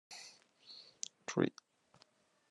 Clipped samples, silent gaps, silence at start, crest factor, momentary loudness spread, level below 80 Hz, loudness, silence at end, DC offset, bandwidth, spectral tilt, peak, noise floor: under 0.1%; none; 0.1 s; 28 dB; 22 LU; -88 dBFS; -41 LUFS; 1 s; under 0.1%; 12 kHz; -4.5 dB/octave; -16 dBFS; -71 dBFS